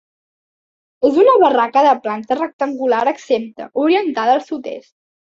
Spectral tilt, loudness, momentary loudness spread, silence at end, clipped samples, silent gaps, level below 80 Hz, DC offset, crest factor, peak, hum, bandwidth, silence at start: -5 dB/octave; -16 LUFS; 14 LU; 0.6 s; under 0.1%; 2.53-2.59 s; -64 dBFS; under 0.1%; 16 dB; -2 dBFS; none; 7.6 kHz; 1 s